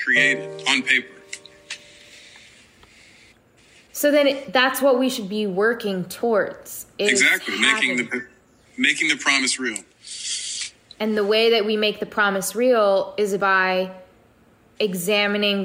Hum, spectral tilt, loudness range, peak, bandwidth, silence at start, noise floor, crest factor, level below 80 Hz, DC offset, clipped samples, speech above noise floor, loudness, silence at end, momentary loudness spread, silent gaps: none; -2.5 dB/octave; 6 LU; -4 dBFS; 16 kHz; 0 s; -55 dBFS; 18 dB; -66 dBFS; under 0.1%; under 0.1%; 35 dB; -20 LUFS; 0 s; 17 LU; none